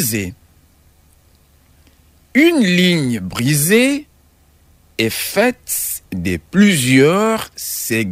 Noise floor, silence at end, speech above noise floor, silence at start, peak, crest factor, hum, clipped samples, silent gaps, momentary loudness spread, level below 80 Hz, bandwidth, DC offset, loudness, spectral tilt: -52 dBFS; 0 s; 37 dB; 0 s; -2 dBFS; 14 dB; none; under 0.1%; none; 11 LU; -48 dBFS; 16 kHz; under 0.1%; -15 LUFS; -4.5 dB/octave